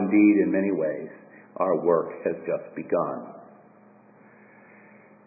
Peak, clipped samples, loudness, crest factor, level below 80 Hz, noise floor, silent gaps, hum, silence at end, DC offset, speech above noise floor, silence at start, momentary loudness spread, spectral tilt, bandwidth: -8 dBFS; under 0.1%; -25 LUFS; 18 dB; -72 dBFS; -54 dBFS; none; none; 1.85 s; under 0.1%; 30 dB; 0 s; 18 LU; -14.5 dB/octave; 2.7 kHz